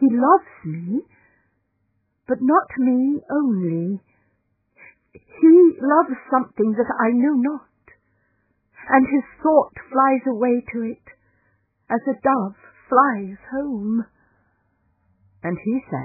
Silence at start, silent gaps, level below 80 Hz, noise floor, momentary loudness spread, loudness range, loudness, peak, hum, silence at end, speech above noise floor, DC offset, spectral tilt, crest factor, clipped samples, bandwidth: 0 s; none; -62 dBFS; -70 dBFS; 13 LU; 5 LU; -19 LUFS; 0 dBFS; none; 0 s; 51 dB; under 0.1%; -14.5 dB/octave; 20 dB; under 0.1%; 2.6 kHz